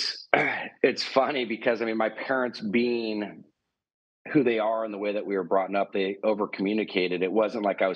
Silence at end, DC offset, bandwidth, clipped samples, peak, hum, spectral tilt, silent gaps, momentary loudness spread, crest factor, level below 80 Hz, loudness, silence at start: 0 s; under 0.1%; 9 kHz; under 0.1%; -4 dBFS; none; -5.5 dB/octave; 3.94-4.25 s; 5 LU; 24 dB; -78 dBFS; -26 LUFS; 0 s